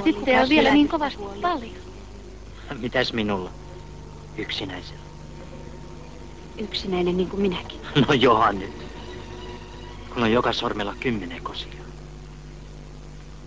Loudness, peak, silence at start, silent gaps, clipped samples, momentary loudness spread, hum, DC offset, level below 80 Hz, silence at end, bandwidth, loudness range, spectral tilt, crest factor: -23 LUFS; -6 dBFS; 0 s; none; under 0.1%; 24 LU; 50 Hz at -45 dBFS; 0.4%; -42 dBFS; 0 s; 8 kHz; 8 LU; -6 dB/octave; 20 dB